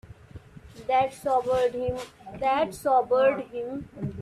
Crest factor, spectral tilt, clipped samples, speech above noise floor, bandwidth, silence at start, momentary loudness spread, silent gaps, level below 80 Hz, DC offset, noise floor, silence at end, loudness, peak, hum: 16 dB; -5.5 dB/octave; under 0.1%; 21 dB; 14 kHz; 0.05 s; 13 LU; none; -56 dBFS; under 0.1%; -47 dBFS; 0 s; -26 LUFS; -10 dBFS; none